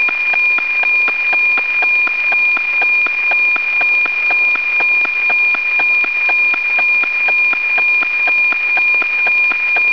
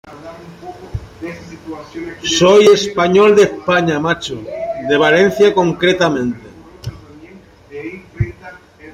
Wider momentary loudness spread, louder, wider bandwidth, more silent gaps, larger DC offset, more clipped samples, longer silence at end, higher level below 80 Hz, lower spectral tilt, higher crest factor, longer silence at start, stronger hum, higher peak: second, 1 LU vs 22 LU; about the same, -11 LUFS vs -13 LUFS; second, 5.4 kHz vs 13 kHz; neither; first, 0.9% vs under 0.1%; neither; about the same, 0 s vs 0.05 s; second, -62 dBFS vs -42 dBFS; second, -1.5 dB/octave vs -4.5 dB/octave; about the same, 10 dB vs 14 dB; about the same, 0 s vs 0.05 s; neither; second, -4 dBFS vs 0 dBFS